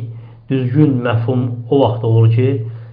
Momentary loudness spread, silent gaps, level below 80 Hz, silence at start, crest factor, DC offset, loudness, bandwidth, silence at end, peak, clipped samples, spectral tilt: 9 LU; none; -52 dBFS; 0 s; 14 dB; under 0.1%; -15 LUFS; 3.9 kHz; 0 s; 0 dBFS; under 0.1%; -12 dB/octave